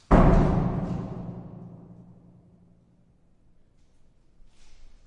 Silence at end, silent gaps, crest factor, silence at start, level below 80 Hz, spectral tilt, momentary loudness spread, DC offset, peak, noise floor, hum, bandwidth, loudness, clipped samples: 0.35 s; none; 22 dB; 0.1 s; -32 dBFS; -9.5 dB/octave; 27 LU; under 0.1%; -6 dBFS; -60 dBFS; none; 7.8 kHz; -25 LUFS; under 0.1%